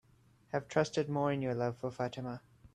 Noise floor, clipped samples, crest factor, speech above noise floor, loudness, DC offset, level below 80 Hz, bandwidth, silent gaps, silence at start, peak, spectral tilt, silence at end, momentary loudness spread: -66 dBFS; under 0.1%; 20 dB; 31 dB; -36 LUFS; under 0.1%; -70 dBFS; 11.5 kHz; none; 0.55 s; -18 dBFS; -6.5 dB/octave; 0.05 s; 10 LU